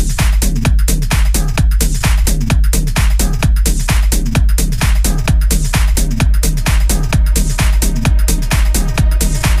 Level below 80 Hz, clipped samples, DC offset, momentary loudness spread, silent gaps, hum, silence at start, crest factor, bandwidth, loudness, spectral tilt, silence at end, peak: -12 dBFS; under 0.1%; under 0.1%; 1 LU; none; none; 0 s; 10 dB; 15.5 kHz; -14 LUFS; -4.5 dB/octave; 0 s; 0 dBFS